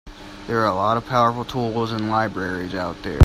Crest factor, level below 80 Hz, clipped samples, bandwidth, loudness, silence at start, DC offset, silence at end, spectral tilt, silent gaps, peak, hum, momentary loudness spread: 20 dB; -36 dBFS; under 0.1%; 15.5 kHz; -22 LUFS; 0.05 s; under 0.1%; 0 s; -7 dB/octave; none; 0 dBFS; none; 8 LU